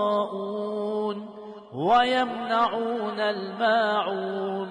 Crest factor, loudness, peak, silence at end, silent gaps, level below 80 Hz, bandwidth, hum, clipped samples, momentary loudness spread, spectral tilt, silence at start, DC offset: 16 dB; -25 LUFS; -10 dBFS; 0 s; none; -68 dBFS; 10.5 kHz; none; under 0.1%; 10 LU; -5.5 dB/octave; 0 s; under 0.1%